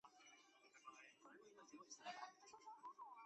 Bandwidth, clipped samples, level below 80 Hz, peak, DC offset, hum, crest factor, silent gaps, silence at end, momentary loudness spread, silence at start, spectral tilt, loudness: 8.2 kHz; under 0.1%; under -90 dBFS; -42 dBFS; under 0.1%; none; 20 dB; none; 0 s; 11 LU; 0.05 s; -1 dB/octave; -61 LUFS